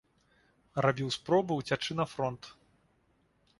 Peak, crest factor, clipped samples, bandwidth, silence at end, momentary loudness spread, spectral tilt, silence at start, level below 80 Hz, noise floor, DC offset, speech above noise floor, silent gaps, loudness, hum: -12 dBFS; 22 dB; under 0.1%; 11.5 kHz; 1.05 s; 11 LU; -5.5 dB/octave; 0.75 s; -66 dBFS; -71 dBFS; under 0.1%; 40 dB; none; -32 LUFS; none